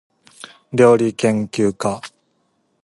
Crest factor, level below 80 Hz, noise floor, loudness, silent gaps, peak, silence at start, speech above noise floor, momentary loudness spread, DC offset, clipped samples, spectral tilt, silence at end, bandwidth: 18 dB; -58 dBFS; -65 dBFS; -17 LUFS; none; 0 dBFS; 0.7 s; 50 dB; 14 LU; under 0.1%; under 0.1%; -6 dB/octave; 0.75 s; 11.5 kHz